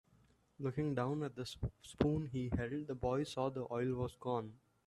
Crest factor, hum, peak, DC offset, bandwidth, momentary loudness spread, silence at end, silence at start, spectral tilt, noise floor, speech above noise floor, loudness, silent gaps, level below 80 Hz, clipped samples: 24 dB; none; -16 dBFS; under 0.1%; 12.5 kHz; 8 LU; 0.3 s; 0.6 s; -7 dB/octave; -71 dBFS; 32 dB; -40 LUFS; none; -58 dBFS; under 0.1%